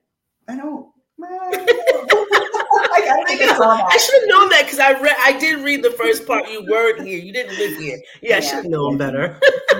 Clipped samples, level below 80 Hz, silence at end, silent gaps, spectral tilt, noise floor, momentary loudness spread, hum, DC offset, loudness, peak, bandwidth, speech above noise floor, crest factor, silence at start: under 0.1%; -62 dBFS; 0 s; none; -2.5 dB/octave; -42 dBFS; 17 LU; none; under 0.1%; -15 LUFS; -2 dBFS; 17 kHz; 27 dB; 14 dB; 0.5 s